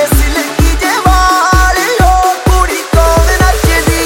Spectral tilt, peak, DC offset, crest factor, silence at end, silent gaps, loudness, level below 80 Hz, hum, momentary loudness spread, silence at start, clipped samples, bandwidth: -4.5 dB/octave; 0 dBFS; under 0.1%; 8 dB; 0 s; none; -9 LUFS; -12 dBFS; none; 3 LU; 0 s; 0.6%; 17 kHz